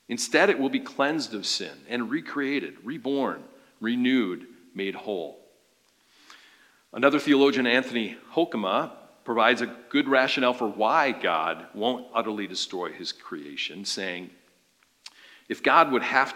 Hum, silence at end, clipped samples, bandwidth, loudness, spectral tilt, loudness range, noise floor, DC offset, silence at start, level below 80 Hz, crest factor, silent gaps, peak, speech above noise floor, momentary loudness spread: none; 0 s; under 0.1%; 16 kHz; -25 LUFS; -3.5 dB/octave; 7 LU; -65 dBFS; under 0.1%; 0.1 s; -84 dBFS; 22 dB; none; -4 dBFS; 40 dB; 14 LU